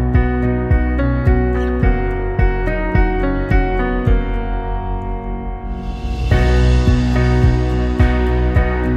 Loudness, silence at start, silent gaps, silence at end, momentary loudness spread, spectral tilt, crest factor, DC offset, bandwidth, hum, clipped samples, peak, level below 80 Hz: -17 LUFS; 0 s; none; 0 s; 10 LU; -8 dB/octave; 14 dB; under 0.1%; 7.6 kHz; none; under 0.1%; -2 dBFS; -18 dBFS